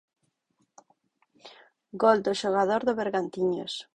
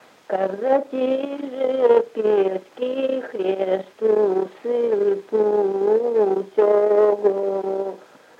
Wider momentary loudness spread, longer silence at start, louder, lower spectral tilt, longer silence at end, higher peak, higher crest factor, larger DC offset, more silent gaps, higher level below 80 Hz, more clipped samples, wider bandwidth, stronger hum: about the same, 7 LU vs 8 LU; first, 1.45 s vs 0.3 s; second, -26 LUFS vs -21 LUFS; second, -5 dB/octave vs -7 dB/octave; second, 0.15 s vs 0.4 s; second, -8 dBFS vs -4 dBFS; first, 22 dB vs 16 dB; neither; neither; first, -70 dBFS vs -80 dBFS; neither; first, 10.5 kHz vs 6.8 kHz; neither